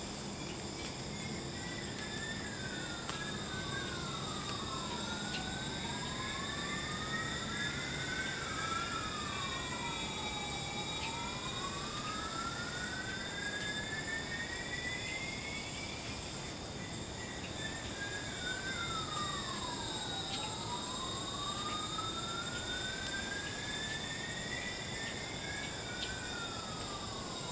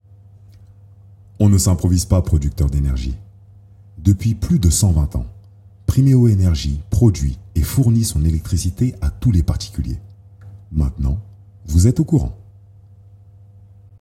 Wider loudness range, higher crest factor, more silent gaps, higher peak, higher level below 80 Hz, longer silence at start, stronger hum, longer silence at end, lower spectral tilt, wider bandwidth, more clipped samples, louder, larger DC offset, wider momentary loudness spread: about the same, 3 LU vs 5 LU; about the same, 20 dB vs 16 dB; neither; second, -20 dBFS vs 0 dBFS; second, -54 dBFS vs -28 dBFS; second, 0 s vs 1.4 s; neither; second, 0 s vs 1.65 s; second, -3 dB/octave vs -6.5 dB/octave; second, 8 kHz vs 16 kHz; neither; second, -39 LUFS vs -18 LUFS; neither; second, 4 LU vs 12 LU